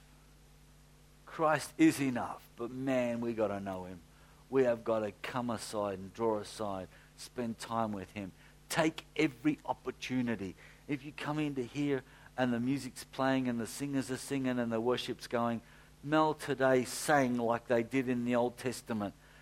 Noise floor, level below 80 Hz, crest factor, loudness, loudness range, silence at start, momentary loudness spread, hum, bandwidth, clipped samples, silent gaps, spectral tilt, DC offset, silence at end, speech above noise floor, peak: -60 dBFS; -64 dBFS; 22 dB; -34 LUFS; 5 LU; 1.25 s; 13 LU; none; 16 kHz; under 0.1%; none; -5.5 dB/octave; under 0.1%; 0 s; 27 dB; -12 dBFS